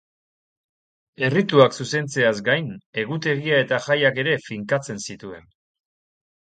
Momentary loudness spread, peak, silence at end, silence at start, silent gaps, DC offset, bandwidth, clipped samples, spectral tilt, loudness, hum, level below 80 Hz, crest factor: 14 LU; 0 dBFS; 1.2 s; 1.2 s; 2.86-2.93 s; under 0.1%; 9.4 kHz; under 0.1%; -5 dB/octave; -21 LUFS; none; -64 dBFS; 22 dB